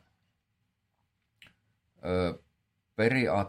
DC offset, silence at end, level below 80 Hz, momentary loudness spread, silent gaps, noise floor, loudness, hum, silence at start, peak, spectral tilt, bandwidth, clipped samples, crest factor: under 0.1%; 0 s; -66 dBFS; 17 LU; none; -79 dBFS; -29 LUFS; none; 2.05 s; -12 dBFS; -7 dB/octave; 13 kHz; under 0.1%; 22 dB